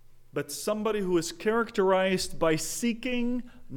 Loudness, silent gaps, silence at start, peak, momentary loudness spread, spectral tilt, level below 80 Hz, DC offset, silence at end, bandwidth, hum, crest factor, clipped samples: -28 LUFS; none; 0.05 s; -12 dBFS; 9 LU; -4 dB/octave; -46 dBFS; under 0.1%; 0 s; 19 kHz; none; 16 dB; under 0.1%